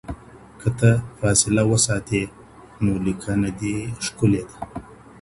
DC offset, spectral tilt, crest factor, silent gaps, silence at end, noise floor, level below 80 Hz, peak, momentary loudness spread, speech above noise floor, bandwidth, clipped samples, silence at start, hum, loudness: under 0.1%; -5 dB/octave; 20 dB; none; 0.05 s; -44 dBFS; -42 dBFS; -2 dBFS; 17 LU; 23 dB; 11.5 kHz; under 0.1%; 0.05 s; none; -21 LUFS